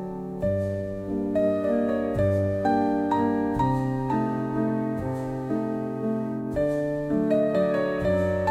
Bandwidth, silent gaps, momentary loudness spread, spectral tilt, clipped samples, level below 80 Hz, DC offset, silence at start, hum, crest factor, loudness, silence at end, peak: 13.5 kHz; none; 6 LU; -9 dB/octave; under 0.1%; -48 dBFS; under 0.1%; 0 s; none; 14 dB; -26 LUFS; 0 s; -12 dBFS